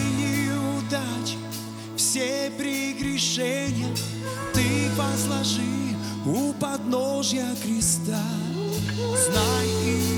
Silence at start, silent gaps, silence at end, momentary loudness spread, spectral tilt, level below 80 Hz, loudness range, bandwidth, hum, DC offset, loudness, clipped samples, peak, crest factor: 0 s; none; 0 s; 7 LU; -4 dB/octave; -50 dBFS; 2 LU; over 20 kHz; none; under 0.1%; -25 LUFS; under 0.1%; -8 dBFS; 16 dB